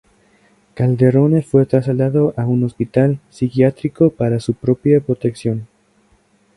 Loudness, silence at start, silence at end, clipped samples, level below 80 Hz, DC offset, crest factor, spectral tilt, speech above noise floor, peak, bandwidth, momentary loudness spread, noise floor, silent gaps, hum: -16 LUFS; 0.75 s; 0.9 s; under 0.1%; -50 dBFS; under 0.1%; 16 dB; -9.5 dB/octave; 41 dB; 0 dBFS; 11.5 kHz; 7 LU; -56 dBFS; none; none